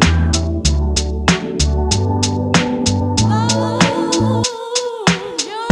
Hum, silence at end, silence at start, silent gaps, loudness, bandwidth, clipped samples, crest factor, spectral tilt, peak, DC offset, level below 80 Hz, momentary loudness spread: none; 0 s; 0 s; none; -16 LUFS; 11.5 kHz; under 0.1%; 16 dB; -4.5 dB/octave; 0 dBFS; under 0.1%; -24 dBFS; 4 LU